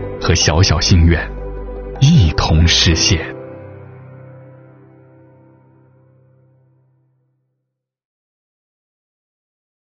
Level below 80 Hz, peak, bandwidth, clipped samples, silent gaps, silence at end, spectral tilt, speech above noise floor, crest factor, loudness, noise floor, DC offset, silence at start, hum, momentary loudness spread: -26 dBFS; 0 dBFS; 6.8 kHz; under 0.1%; none; 5.55 s; -4.5 dB/octave; 65 dB; 18 dB; -13 LUFS; -76 dBFS; under 0.1%; 0 s; none; 22 LU